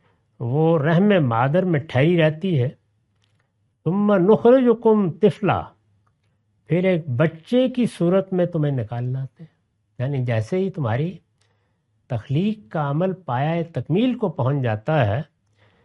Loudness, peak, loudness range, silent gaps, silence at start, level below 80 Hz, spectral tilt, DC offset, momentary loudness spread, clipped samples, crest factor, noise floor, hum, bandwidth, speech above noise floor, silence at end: -21 LUFS; -4 dBFS; 6 LU; none; 0.4 s; -60 dBFS; -9 dB/octave; under 0.1%; 10 LU; under 0.1%; 18 dB; -67 dBFS; none; 11.5 kHz; 48 dB; 0.6 s